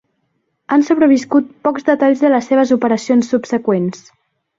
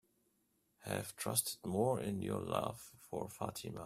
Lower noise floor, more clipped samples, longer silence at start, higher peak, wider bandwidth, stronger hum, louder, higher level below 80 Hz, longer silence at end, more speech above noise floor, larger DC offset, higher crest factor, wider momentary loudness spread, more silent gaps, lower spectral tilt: second, -67 dBFS vs -79 dBFS; neither; about the same, 0.7 s vs 0.8 s; first, -2 dBFS vs -18 dBFS; second, 7.6 kHz vs 16 kHz; neither; first, -14 LUFS vs -39 LUFS; first, -60 dBFS vs -70 dBFS; first, 0.65 s vs 0 s; first, 54 dB vs 39 dB; neither; second, 14 dB vs 24 dB; second, 6 LU vs 10 LU; neither; first, -6 dB/octave vs -4.5 dB/octave